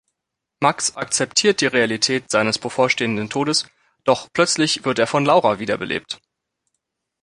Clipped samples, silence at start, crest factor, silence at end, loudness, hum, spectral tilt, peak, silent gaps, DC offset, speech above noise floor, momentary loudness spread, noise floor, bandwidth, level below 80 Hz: under 0.1%; 0.6 s; 18 dB; 1.05 s; -19 LUFS; none; -3 dB/octave; -2 dBFS; none; under 0.1%; 62 dB; 8 LU; -81 dBFS; 11.5 kHz; -60 dBFS